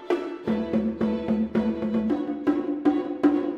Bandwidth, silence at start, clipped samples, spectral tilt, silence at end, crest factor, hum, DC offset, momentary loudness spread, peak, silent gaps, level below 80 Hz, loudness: 6.6 kHz; 0 s; under 0.1%; -8.5 dB/octave; 0 s; 16 dB; none; under 0.1%; 4 LU; -8 dBFS; none; -52 dBFS; -26 LUFS